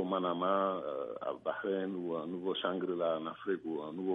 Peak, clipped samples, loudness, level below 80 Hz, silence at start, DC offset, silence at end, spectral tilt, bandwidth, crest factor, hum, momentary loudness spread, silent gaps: -18 dBFS; under 0.1%; -36 LUFS; -80 dBFS; 0 s; under 0.1%; 0 s; -8.5 dB/octave; 3.9 kHz; 18 dB; none; 7 LU; none